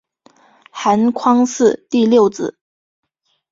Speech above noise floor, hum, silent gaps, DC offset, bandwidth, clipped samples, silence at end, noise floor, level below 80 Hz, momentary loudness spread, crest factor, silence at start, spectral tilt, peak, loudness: 38 dB; none; none; under 0.1%; 7.8 kHz; under 0.1%; 1 s; -52 dBFS; -60 dBFS; 13 LU; 16 dB; 0.75 s; -5 dB/octave; -2 dBFS; -15 LUFS